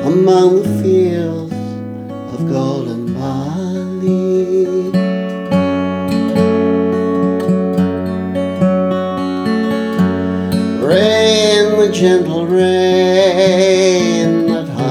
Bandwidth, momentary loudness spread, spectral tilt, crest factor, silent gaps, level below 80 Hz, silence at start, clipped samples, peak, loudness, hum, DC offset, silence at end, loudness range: 14 kHz; 10 LU; -6 dB/octave; 12 dB; none; -52 dBFS; 0 s; under 0.1%; 0 dBFS; -14 LUFS; none; under 0.1%; 0 s; 6 LU